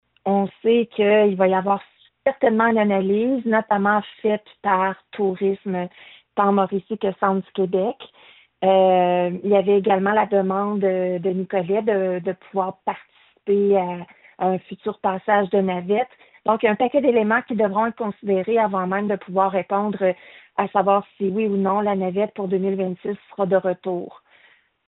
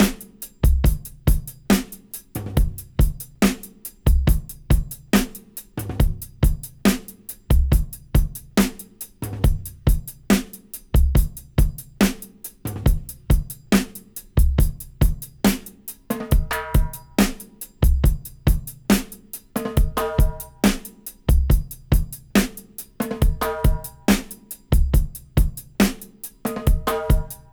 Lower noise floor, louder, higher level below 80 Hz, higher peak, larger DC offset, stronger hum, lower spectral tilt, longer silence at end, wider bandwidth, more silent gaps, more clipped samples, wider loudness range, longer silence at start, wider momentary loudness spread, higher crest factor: first, -56 dBFS vs -40 dBFS; about the same, -21 LUFS vs -23 LUFS; second, -66 dBFS vs -24 dBFS; about the same, -4 dBFS vs -2 dBFS; neither; neither; about the same, -5.5 dB/octave vs -5.5 dB/octave; first, 0.8 s vs 0.15 s; second, 4 kHz vs over 20 kHz; neither; neither; first, 4 LU vs 1 LU; first, 0.25 s vs 0 s; second, 9 LU vs 14 LU; about the same, 16 dB vs 18 dB